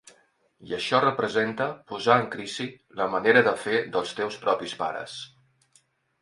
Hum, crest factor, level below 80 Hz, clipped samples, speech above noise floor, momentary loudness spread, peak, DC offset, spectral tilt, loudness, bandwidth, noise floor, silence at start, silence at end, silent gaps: none; 22 dB; -68 dBFS; under 0.1%; 39 dB; 15 LU; -4 dBFS; under 0.1%; -4.5 dB/octave; -25 LUFS; 11.5 kHz; -65 dBFS; 0.6 s; 0.95 s; none